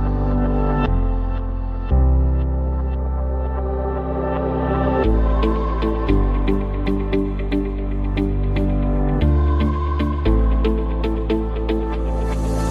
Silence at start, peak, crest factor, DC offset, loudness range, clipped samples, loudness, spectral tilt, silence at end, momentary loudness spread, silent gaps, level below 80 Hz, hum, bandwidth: 0 s; -4 dBFS; 14 dB; under 0.1%; 2 LU; under 0.1%; -21 LUFS; -8.5 dB/octave; 0 s; 5 LU; none; -20 dBFS; none; 6.4 kHz